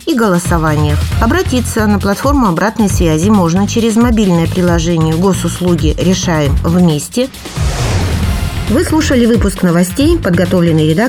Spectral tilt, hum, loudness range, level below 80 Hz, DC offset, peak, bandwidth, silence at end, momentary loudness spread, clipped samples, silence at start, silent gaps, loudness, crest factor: -6 dB/octave; none; 2 LU; -22 dBFS; under 0.1%; 0 dBFS; 17.5 kHz; 0 s; 5 LU; under 0.1%; 0 s; none; -12 LUFS; 10 dB